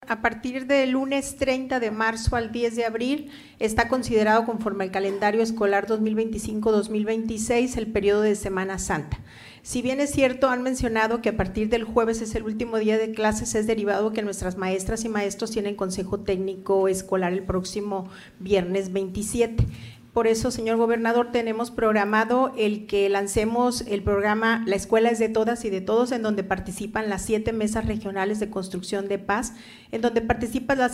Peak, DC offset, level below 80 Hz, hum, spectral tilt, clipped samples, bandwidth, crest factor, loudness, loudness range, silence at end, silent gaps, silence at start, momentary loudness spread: -6 dBFS; under 0.1%; -42 dBFS; none; -5 dB/octave; under 0.1%; 15.5 kHz; 18 dB; -24 LUFS; 4 LU; 0 s; none; 0 s; 7 LU